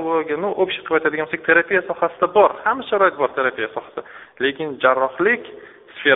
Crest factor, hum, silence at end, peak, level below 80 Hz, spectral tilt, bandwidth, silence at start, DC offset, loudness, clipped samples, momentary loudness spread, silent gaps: 18 dB; none; 0 s; 0 dBFS; -62 dBFS; -1.5 dB/octave; 4 kHz; 0 s; under 0.1%; -19 LUFS; under 0.1%; 11 LU; none